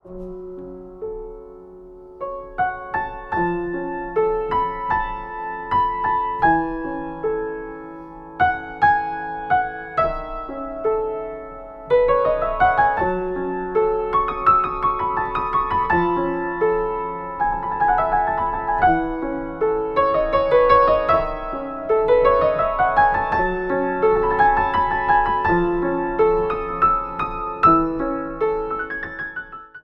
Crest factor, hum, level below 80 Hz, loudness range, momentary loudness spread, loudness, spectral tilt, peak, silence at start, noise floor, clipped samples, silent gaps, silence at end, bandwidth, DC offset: 18 dB; none; -38 dBFS; 6 LU; 14 LU; -20 LUFS; -8.5 dB/octave; -2 dBFS; 0.05 s; -41 dBFS; under 0.1%; none; 0.05 s; 5.8 kHz; under 0.1%